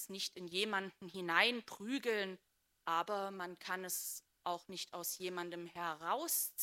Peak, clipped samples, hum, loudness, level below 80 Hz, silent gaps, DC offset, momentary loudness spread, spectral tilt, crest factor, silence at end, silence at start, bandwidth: -14 dBFS; under 0.1%; none; -39 LUFS; -88 dBFS; none; under 0.1%; 11 LU; -2 dB/octave; 26 dB; 0 s; 0 s; 16 kHz